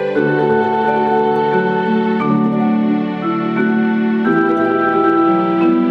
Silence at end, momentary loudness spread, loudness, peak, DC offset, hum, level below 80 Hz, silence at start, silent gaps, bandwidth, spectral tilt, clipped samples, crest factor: 0 s; 3 LU; -15 LUFS; -4 dBFS; under 0.1%; none; -58 dBFS; 0 s; none; 5.6 kHz; -9 dB/octave; under 0.1%; 12 dB